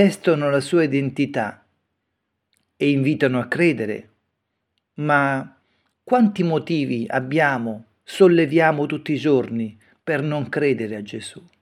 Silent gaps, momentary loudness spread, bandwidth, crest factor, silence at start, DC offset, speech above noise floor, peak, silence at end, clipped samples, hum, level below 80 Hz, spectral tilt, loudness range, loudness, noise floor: none; 14 LU; 13.5 kHz; 20 dB; 0 s; under 0.1%; 57 dB; -2 dBFS; 0.2 s; under 0.1%; none; -70 dBFS; -7 dB/octave; 4 LU; -20 LUFS; -76 dBFS